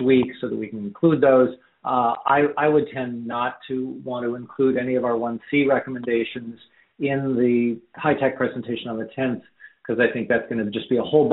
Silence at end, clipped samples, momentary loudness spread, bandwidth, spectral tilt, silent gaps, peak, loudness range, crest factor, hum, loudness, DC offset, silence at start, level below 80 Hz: 0 s; under 0.1%; 10 LU; 4.1 kHz; -5 dB/octave; none; -4 dBFS; 3 LU; 18 dB; none; -22 LUFS; under 0.1%; 0 s; -62 dBFS